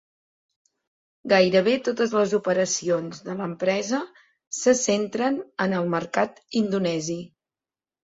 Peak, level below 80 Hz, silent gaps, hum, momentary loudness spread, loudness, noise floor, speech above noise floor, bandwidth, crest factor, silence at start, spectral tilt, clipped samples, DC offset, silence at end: -6 dBFS; -68 dBFS; 4.47-4.51 s; none; 12 LU; -24 LUFS; under -90 dBFS; over 67 dB; 8 kHz; 20 dB; 1.25 s; -4 dB/octave; under 0.1%; under 0.1%; 0.8 s